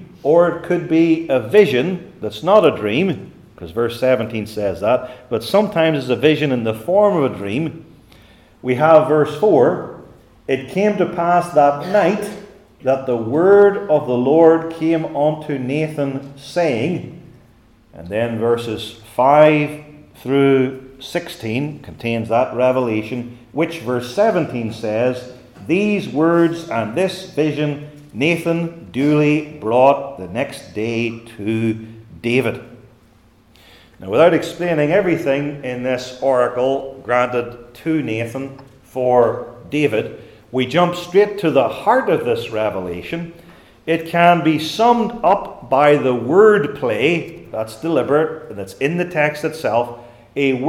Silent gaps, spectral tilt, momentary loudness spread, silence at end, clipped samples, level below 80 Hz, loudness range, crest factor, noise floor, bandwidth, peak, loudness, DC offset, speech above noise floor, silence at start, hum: none; -6.5 dB/octave; 14 LU; 0 s; under 0.1%; -56 dBFS; 5 LU; 18 dB; -51 dBFS; 15.5 kHz; 0 dBFS; -17 LUFS; under 0.1%; 34 dB; 0 s; none